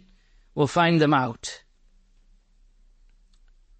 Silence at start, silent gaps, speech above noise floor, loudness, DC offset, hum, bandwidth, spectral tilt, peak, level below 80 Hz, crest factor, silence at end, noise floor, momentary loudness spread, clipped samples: 0.55 s; none; 37 dB; -23 LUFS; under 0.1%; none; 8.4 kHz; -5.5 dB/octave; -8 dBFS; -56 dBFS; 20 dB; 2.2 s; -59 dBFS; 18 LU; under 0.1%